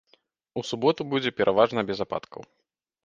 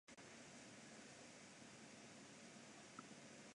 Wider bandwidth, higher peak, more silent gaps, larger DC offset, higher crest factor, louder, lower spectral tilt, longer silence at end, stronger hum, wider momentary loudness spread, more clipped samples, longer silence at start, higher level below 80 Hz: second, 7.6 kHz vs 11 kHz; first, -4 dBFS vs -40 dBFS; neither; neither; about the same, 22 dB vs 20 dB; first, -26 LUFS vs -60 LUFS; first, -5.5 dB/octave vs -3 dB/octave; first, 0.65 s vs 0 s; neither; first, 15 LU vs 1 LU; neither; first, 0.55 s vs 0.05 s; first, -62 dBFS vs -90 dBFS